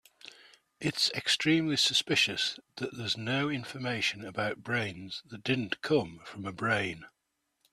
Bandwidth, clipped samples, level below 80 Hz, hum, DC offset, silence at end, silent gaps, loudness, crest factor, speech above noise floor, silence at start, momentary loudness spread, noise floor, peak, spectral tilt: 14.5 kHz; under 0.1%; -70 dBFS; none; under 0.1%; 0.65 s; none; -30 LUFS; 20 dB; 49 dB; 0.25 s; 16 LU; -81 dBFS; -12 dBFS; -3.5 dB/octave